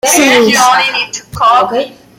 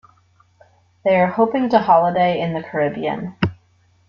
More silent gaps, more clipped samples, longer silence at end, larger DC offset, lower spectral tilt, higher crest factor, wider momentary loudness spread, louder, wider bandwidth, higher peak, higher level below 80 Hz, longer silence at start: neither; neither; second, 0.3 s vs 0.55 s; neither; second, -1.5 dB/octave vs -8.5 dB/octave; second, 10 dB vs 18 dB; about the same, 10 LU vs 10 LU; first, -9 LUFS vs -18 LUFS; first, 17 kHz vs 6.6 kHz; about the same, 0 dBFS vs -2 dBFS; first, -46 dBFS vs -54 dBFS; second, 0.05 s vs 1.05 s